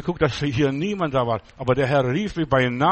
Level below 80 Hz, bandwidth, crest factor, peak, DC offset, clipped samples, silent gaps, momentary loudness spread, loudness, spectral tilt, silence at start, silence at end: -44 dBFS; 8.4 kHz; 16 dB; -6 dBFS; under 0.1%; under 0.1%; none; 5 LU; -22 LUFS; -7 dB/octave; 0 s; 0 s